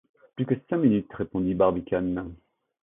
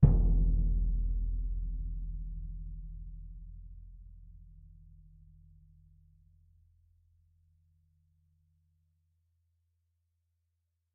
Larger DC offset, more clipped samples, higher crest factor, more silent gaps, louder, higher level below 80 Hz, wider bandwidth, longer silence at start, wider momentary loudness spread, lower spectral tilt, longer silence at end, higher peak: neither; neither; second, 18 dB vs 26 dB; neither; first, -26 LUFS vs -35 LUFS; second, -52 dBFS vs -36 dBFS; first, 3.8 kHz vs 1.2 kHz; first, 0.35 s vs 0 s; second, 11 LU vs 26 LU; about the same, -12.5 dB/octave vs -13 dB/octave; second, 0.5 s vs 6.5 s; about the same, -8 dBFS vs -8 dBFS